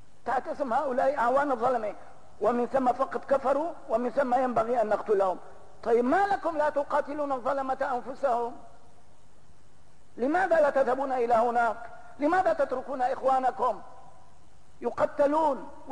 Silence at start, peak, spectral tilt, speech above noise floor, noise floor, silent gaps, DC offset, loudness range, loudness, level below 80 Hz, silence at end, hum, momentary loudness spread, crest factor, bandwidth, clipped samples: 0.25 s; -14 dBFS; -5.5 dB/octave; 34 dB; -60 dBFS; none; 0.8%; 4 LU; -27 LUFS; -62 dBFS; 0 s; none; 7 LU; 12 dB; 10.5 kHz; under 0.1%